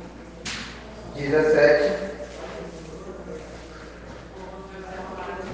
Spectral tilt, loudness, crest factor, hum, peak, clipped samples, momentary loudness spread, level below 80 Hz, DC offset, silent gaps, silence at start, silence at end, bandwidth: -5 dB/octave; -24 LUFS; 24 dB; none; -4 dBFS; under 0.1%; 23 LU; -46 dBFS; under 0.1%; none; 0 s; 0 s; 9.4 kHz